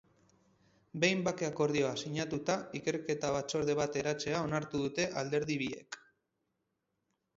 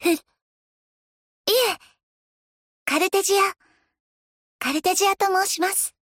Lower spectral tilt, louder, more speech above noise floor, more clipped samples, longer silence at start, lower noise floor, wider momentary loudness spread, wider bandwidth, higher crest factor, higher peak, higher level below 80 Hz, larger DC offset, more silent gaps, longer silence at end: first, -4.5 dB/octave vs 0 dB/octave; second, -34 LUFS vs -22 LUFS; second, 49 dB vs over 69 dB; neither; first, 0.95 s vs 0 s; second, -83 dBFS vs under -90 dBFS; second, 6 LU vs 9 LU; second, 7.6 kHz vs 17 kHz; about the same, 20 dB vs 18 dB; second, -16 dBFS vs -8 dBFS; about the same, -68 dBFS vs -68 dBFS; neither; second, none vs 0.42-1.44 s, 2.03-2.86 s, 4.00-4.59 s; first, 1.4 s vs 0.25 s